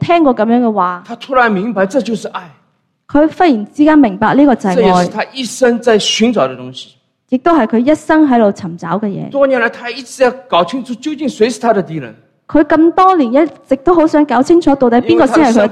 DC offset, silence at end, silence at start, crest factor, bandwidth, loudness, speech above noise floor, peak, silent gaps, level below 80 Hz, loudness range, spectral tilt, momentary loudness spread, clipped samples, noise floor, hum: under 0.1%; 0 s; 0 s; 12 dB; 12 kHz; -11 LUFS; 38 dB; 0 dBFS; none; -44 dBFS; 4 LU; -5.5 dB/octave; 11 LU; under 0.1%; -49 dBFS; none